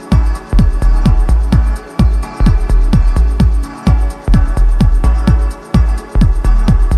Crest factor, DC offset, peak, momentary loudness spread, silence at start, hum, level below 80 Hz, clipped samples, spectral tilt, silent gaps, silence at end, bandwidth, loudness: 8 dB; under 0.1%; 0 dBFS; 3 LU; 0 s; none; -10 dBFS; under 0.1%; -7.5 dB/octave; none; 0 s; 9.6 kHz; -13 LUFS